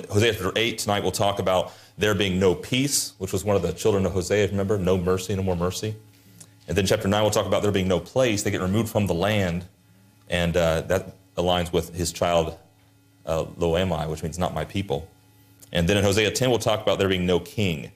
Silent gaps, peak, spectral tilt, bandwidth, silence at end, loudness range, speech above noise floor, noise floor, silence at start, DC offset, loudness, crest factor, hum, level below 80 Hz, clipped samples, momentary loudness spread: none; -8 dBFS; -4.5 dB/octave; 15.5 kHz; 0.05 s; 3 LU; 34 dB; -57 dBFS; 0 s; under 0.1%; -24 LUFS; 16 dB; none; -50 dBFS; under 0.1%; 7 LU